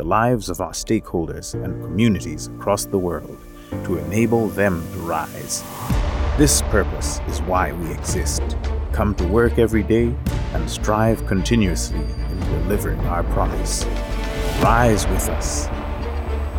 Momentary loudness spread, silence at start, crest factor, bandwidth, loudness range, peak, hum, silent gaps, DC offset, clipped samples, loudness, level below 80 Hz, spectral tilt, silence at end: 9 LU; 0 s; 18 dB; 19 kHz; 3 LU; -2 dBFS; none; none; under 0.1%; under 0.1%; -21 LUFS; -26 dBFS; -5 dB/octave; 0 s